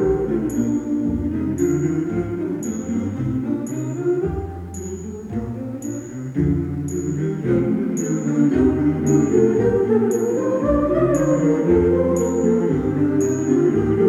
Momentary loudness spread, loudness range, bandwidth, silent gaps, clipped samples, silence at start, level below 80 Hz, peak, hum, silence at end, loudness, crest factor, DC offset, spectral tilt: 11 LU; 7 LU; 12.5 kHz; none; under 0.1%; 0 s; -40 dBFS; -4 dBFS; none; 0 s; -20 LUFS; 14 dB; under 0.1%; -8 dB/octave